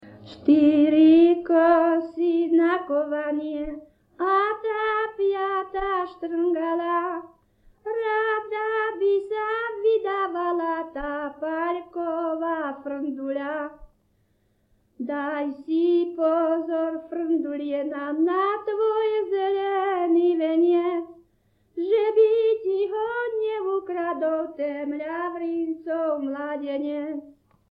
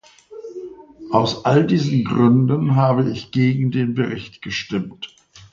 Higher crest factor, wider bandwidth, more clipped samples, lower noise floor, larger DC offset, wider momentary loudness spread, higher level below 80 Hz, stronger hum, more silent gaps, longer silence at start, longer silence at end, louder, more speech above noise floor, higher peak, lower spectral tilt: about the same, 16 dB vs 18 dB; second, 5 kHz vs 7.2 kHz; neither; first, -67 dBFS vs -38 dBFS; neither; second, 12 LU vs 20 LU; about the same, -58 dBFS vs -54 dBFS; neither; neither; second, 0 s vs 0.3 s; first, 0.4 s vs 0.1 s; second, -24 LUFS vs -18 LUFS; first, 43 dB vs 20 dB; second, -8 dBFS vs 0 dBFS; about the same, -7.5 dB/octave vs -7.5 dB/octave